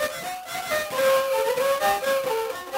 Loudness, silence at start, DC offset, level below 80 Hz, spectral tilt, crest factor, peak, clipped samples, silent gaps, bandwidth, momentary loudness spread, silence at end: -24 LUFS; 0 s; under 0.1%; -60 dBFS; -1.5 dB/octave; 16 dB; -10 dBFS; under 0.1%; none; 16.5 kHz; 9 LU; 0 s